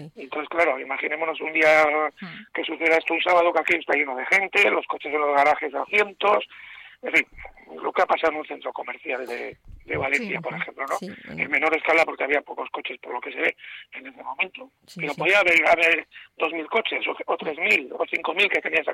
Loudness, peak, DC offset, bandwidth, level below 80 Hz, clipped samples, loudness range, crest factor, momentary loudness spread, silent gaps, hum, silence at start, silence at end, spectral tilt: -22 LUFS; -6 dBFS; under 0.1%; 15.5 kHz; -60 dBFS; under 0.1%; 6 LU; 18 dB; 15 LU; none; none; 0 s; 0 s; -3.5 dB/octave